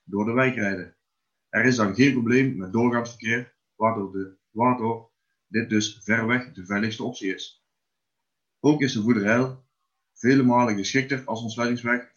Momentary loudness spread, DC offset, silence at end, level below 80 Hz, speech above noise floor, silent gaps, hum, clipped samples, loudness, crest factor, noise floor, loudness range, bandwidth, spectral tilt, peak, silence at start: 11 LU; under 0.1%; 0.15 s; -68 dBFS; 60 dB; none; none; under 0.1%; -24 LUFS; 20 dB; -83 dBFS; 4 LU; 7.4 kHz; -5.5 dB/octave; -6 dBFS; 0.1 s